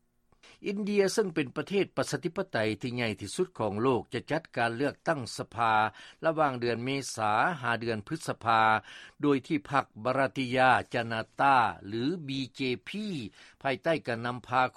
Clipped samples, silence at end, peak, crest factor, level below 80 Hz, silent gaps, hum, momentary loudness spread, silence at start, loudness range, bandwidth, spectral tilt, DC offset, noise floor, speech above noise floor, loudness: under 0.1%; 0.05 s; -8 dBFS; 20 dB; -66 dBFS; none; none; 10 LU; 0.6 s; 3 LU; 14 kHz; -5 dB/octave; under 0.1%; -62 dBFS; 32 dB; -30 LUFS